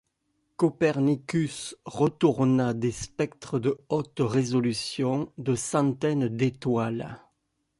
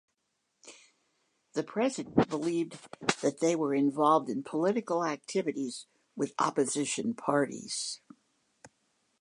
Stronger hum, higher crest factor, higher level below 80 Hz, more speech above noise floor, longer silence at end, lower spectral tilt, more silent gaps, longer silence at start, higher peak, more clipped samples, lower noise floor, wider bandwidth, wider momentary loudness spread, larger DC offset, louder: neither; about the same, 18 dB vs 22 dB; first, -60 dBFS vs -68 dBFS; about the same, 50 dB vs 50 dB; about the same, 0.6 s vs 0.55 s; first, -6 dB/octave vs -4.5 dB/octave; neither; about the same, 0.6 s vs 0.65 s; about the same, -10 dBFS vs -10 dBFS; neither; second, -76 dBFS vs -80 dBFS; about the same, 11.5 kHz vs 11 kHz; about the same, 8 LU vs 10 LU; neither; first, -27 LUFS vs -31 LUFS